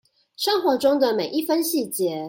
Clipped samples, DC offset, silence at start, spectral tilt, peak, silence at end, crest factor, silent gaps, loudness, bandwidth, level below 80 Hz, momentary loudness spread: under 0.1%; under 0.1%; 0.4 s; -3.5 dB/octave; -8 dBFS; 0 s; 16 dB; none; -22 LUFS; 17 kHz; -68 dBFS; 5 LU